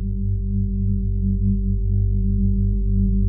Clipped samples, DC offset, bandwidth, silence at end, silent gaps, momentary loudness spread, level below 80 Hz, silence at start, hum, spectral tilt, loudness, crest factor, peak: under 0.1%; under 0.1%; 0.4 kHz; 0 s; none; 3 LU; -22 dBFS; 0 s; 50 Hz at -35 dBFS; -21 dB/octave; -22 LUFS; 10 dB; -8 dBFS